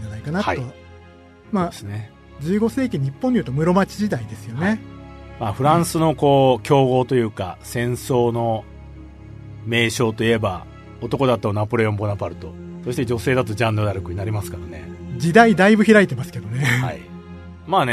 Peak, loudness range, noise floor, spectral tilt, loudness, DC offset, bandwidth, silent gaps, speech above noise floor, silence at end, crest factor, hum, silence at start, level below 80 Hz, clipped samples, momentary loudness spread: 0 dBFS; 5 LU; -45 dBFS; -6 dB/octave; -19 LUFS; under 0.1%; 13.5 kHz; none; 26 dB; 0 s; 20 dB; none; 0 s; -46 dBFS; under 0.1%; 20 LU